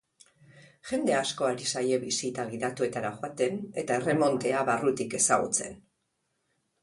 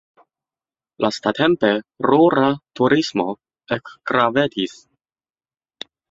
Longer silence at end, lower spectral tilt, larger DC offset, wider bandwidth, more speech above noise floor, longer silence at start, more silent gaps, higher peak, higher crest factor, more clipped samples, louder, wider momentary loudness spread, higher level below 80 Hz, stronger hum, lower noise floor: second, 1.05 s vs 1.4 s; second, -3.5 dB/octave vs -5.5 dB/octave; neither; first, 11.5 kHz vs 7.8 kHz; second, 49 dB vs over 72 dB; second, 0.55 s vs 1 s; neither; second, -8 dBFS vs -2 dBFS; about the same, 22 dB vs 18 dB; neither; second, -28 LUFS vs -19 LUFS; second, 9 LU vs 13 LU; second, -68 dBFS vs -60 dBFS; neither; second, -78 dBFS vs under -90 dBFS